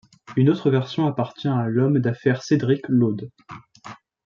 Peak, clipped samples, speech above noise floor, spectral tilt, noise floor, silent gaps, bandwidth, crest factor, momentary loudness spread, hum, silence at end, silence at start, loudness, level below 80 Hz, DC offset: -6 dBFS; under 0.1%; 23 dB; -8 dB/octave; -43 dBFS; none; 7.2 kHz; 16 dB; 20 LU; none; 0.3 s; 0.3 s; -21 LUFS; -64 dBFS; under 0.1%